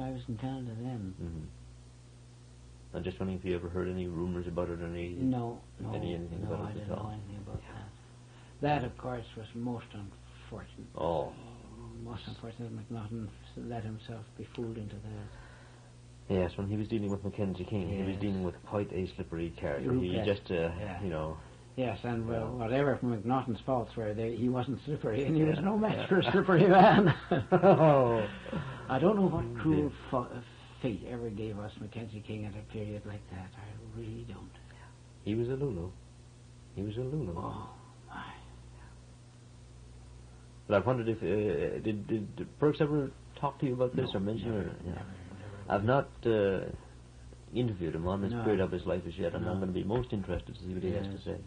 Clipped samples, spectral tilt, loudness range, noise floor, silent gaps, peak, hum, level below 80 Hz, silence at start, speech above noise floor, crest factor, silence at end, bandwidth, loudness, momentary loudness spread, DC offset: under 0.1%; -8 dB/octave; 15 LU; -54 dBFS; none; -10 dBFS; none; -54 dBFS; 0 s; 22 dB; 24 dB; 0 s; 10 kHz; -33 LUFS; 19 LU; under 0.1%